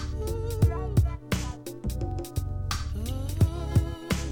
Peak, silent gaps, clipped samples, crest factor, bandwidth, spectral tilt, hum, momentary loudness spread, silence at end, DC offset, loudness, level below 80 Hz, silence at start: -10 dBFS; none; under 0.1%; 18 dB; 18 kHz; -6 dB/octave; none; 7 LU; 0 s; 0.2%; -29 LUFS; -32 dBFS; 0 s